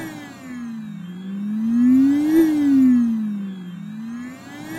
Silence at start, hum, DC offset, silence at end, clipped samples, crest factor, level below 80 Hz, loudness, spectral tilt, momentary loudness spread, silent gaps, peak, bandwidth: 0 s; none; under 0.1%; 0 s; under 0.1%; 14 dB; -60 dBFS; -18 LUFS; -7 dB/octave; 19 LU; none; -6 dBFS; 12.5 kHz